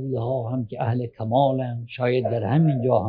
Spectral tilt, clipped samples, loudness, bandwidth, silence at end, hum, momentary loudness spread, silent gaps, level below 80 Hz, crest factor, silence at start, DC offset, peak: -12 dB/octave; under 0.1%; -23 LUFS; 4.9 kHz; 0 s; none; 7 LU; none; -60 dBFS; 16 dB; 0 s; under 0.1%; -6 dBFS